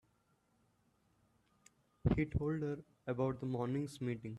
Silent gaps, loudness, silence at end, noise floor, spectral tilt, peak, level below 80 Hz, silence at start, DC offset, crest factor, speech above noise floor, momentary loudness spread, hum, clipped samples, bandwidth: none; -39 LUFS; 0 s; -77 dBFS; -8.5 dB/octave; -18 dBFS; -54 dBFS; 2.05 s; under 0.1%; 22 dB; 38 dB; 7 LU; none; under 0.1%; 12.5 kHz